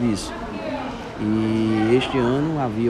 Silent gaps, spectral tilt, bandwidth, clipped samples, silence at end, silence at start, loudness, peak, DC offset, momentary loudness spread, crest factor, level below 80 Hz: none; -6.5 dB/octave; 12.5 kHz; under 0.1%; 0 s; 0 s; -22 LUFS; -6 dBFS; under 0.1%; 11 LU; 14 dB; -44 dBFS